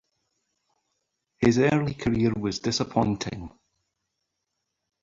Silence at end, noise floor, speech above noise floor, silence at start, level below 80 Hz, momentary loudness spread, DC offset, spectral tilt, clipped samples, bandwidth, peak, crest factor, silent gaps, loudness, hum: 1.55 s; -81 dBFS; 57 dB; 1.4 s; -52 dBFS; 12 LU; under 0.1%; -6 dB/octave; under 0.1%; 7.6 kHz; -8 dBFS; 20 dB; none; -25 LUFS; none